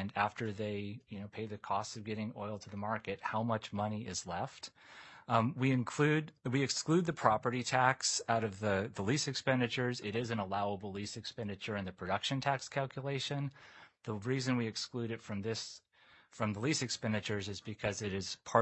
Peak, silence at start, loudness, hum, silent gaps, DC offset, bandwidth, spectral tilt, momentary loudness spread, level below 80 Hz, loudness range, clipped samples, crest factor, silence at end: -10 dBFS; 0 s; -36 LUFS; none; none; under 0.1%; 8.4 kHz; -4.5 dB/octave; 12 LU; -72 dBFS; 7 LU; under 0.1%; 26 dB; 0 s